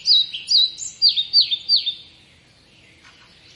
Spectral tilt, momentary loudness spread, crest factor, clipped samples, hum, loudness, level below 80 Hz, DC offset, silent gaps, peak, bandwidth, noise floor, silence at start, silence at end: 2 dB/octave; 6 LU; 18 dB; under 0.1%; none; -16 LUFS; -66 dBFS; under 0.1%; none; -4 dBFS; 11.5 kHz; -52 dBFS; 0 s; 1.55 s